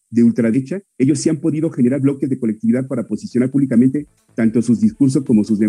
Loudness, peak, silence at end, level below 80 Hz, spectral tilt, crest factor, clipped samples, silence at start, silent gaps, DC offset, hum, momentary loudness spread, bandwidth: -17 LUFS; -4 dBFS; 0 s; -56 dBFS; -7.5 dB/octave; 12 dB; under 0.1%; 0.1 s; none; under 0.1%; none; 7 LU; 10.5 kHz